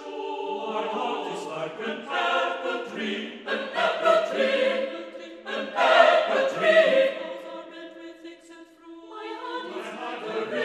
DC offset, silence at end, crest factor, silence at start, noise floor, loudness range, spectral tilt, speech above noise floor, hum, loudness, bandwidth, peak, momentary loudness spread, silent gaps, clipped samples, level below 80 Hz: under 0.1%; 0 s; 24 dB; 0 s; -49 dBFS; 8 LU; -3.5 dB/octave; 18 dB; none; -25 LUFS; 11.5 kHz; -2 dBFS; 21 LU; none; under 0.1%; -78 dBFS